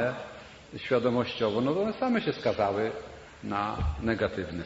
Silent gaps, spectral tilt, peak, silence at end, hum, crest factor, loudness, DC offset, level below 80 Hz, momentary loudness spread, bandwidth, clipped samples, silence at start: none; -7 dB/octave; -12 dBFS; 0 s; none; 18 dB; -29 LUFS; under 0.1%; -44 dBFS; 15 LU; 8 kHz; under 0.1%; 0 s